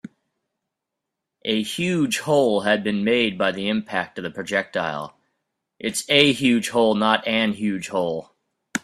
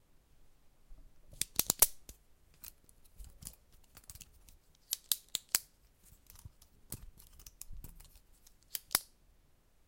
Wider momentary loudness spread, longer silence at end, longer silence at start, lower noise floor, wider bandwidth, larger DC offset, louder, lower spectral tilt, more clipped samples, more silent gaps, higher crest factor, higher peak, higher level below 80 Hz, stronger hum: second, 13 LU vs 28 LU; second, 0.05 s vs 0.85 s; first, 1.45 s vs 0.4 s; first, -83 dBFS vs -67 dBFS; second, 14.5 kHz vs 17 kHz; neither; first, -21 LUFS vs -33 LUFS; first, -4 dB/octave vs 0 dB/octave; neither; neither; second, 22 dB vs 36 dB; first, 0 dBFS vs -6 dBFS; about the same, -62 dBFS vs -58 dBFS; neither